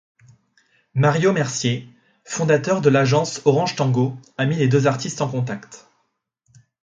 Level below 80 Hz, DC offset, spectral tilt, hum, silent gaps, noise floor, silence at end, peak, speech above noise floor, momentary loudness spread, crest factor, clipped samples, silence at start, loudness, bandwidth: -60 dBFS; under 0.1%; -5.5 dB/octave; none; none; -71 dBFS; 1.05 s; -2 dBFS; 52 dB; 10 LU; 18 dB; under 0.1%; 0.95 s; -20 LUFS; 9.4 kHz